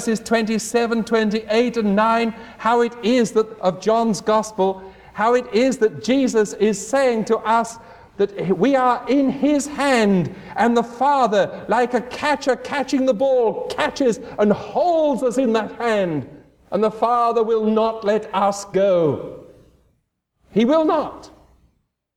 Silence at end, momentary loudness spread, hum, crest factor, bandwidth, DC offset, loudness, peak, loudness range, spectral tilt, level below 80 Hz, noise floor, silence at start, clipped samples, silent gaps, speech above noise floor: 0.9 s; 6 LU; none; 16 dB; 14.5 kHz; under 0.1%; -19 LUFS; -4 dBFS; 2 LU; -5 dB/octave; -56 dBFS; -69 dBFS; 0 s; under 0.1%; none; 51 dB